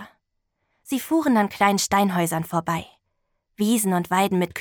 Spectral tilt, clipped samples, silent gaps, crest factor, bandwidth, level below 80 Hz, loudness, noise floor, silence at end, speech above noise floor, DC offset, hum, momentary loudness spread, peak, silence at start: -4.5 dB/octave; under 0.1%; none; 16 dB; over 20 kHz; -60 dBFS; -22 LUFS; -75 dBFS; 0 s; 54 dB; under 0.1%; none; 9 LU; -6 dBFS; 0 s